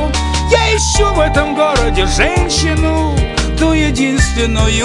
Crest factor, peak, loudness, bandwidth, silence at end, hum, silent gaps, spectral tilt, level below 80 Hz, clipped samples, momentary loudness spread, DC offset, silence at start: 12 dB; 0 dBFS; -13 LUFS; 11.5 kHz; 0 s; none; none; -4.5 dB/octave; -18 dBFS; under 0.1%; 3 LU; under 0.1%; 0 s